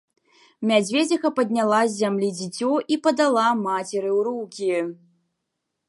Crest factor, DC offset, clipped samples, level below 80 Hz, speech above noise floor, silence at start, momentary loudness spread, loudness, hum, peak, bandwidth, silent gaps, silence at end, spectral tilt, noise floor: 18 dB; under 0.1%; under 0.1%; -76 dBFS; 58 dB; 0.6 s; 7 LU; -22 LUFS; none; -6 dBFS; 11.5 kHz; none; 0.95 s; -4.5 dB/octave; -80 dBFS